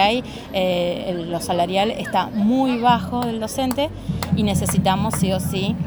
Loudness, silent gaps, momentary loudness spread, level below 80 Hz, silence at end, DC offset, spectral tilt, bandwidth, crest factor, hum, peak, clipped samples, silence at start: -21 LUFS; none; 7 LU; -42 dBFS; 0 s; under 0.1%; -5.5 dB/octave; over 20 kHz; 16 dB; none; -4 dBFS; under 0.1%; 0 s